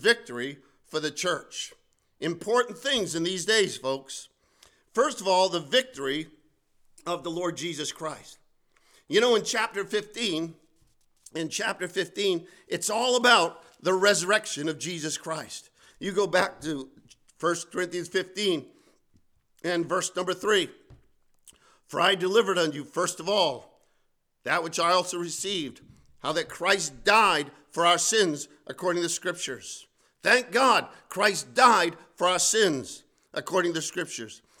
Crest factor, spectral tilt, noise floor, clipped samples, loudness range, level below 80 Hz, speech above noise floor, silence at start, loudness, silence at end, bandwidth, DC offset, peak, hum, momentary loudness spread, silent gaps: 24 dB; -2.5 dB/octave; -71 dBFS; under 0.1%; 6 LU; -68 dBFS; 44 dB; 0 s; -26 LUFS; 0.25 s; 18 kHz; under 0.1%; -4 dBFS; none; 15 LU; none